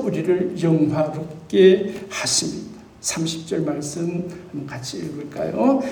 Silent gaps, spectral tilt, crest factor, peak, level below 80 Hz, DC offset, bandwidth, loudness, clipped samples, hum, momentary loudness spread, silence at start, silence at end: none; -5 dB/octave; 20 dB; -2 dBFS; -56 dBFS; under 0.1%; 19.5 kHz; -21 LUFS; under 0.1%; none; 16 LU; 0 s; 0 s